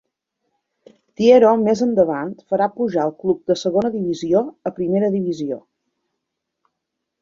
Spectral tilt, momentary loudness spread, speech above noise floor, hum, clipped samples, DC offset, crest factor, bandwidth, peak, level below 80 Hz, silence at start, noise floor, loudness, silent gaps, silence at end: -6.5 dB/octave; 13 LU; 62 dB; none; under 0.1%; under 0.1%; 18 dB; 7.6 kHz; -2 dBFS; -60 dBFS; 1.2 s; -79 dBFS; -18 LUFS; none; 1.65 s